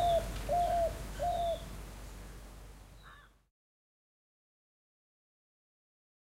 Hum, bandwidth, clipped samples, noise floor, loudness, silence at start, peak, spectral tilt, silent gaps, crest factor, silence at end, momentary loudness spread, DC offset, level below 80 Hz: none; 16 kHz; under 0.1%; -57 dBFS; -34 LUFS; 0 s; -22 dBFS; -5 dB/octave; none; 16 dB; 3.15 s; 23 LU; under 0.1%; -48 dBFS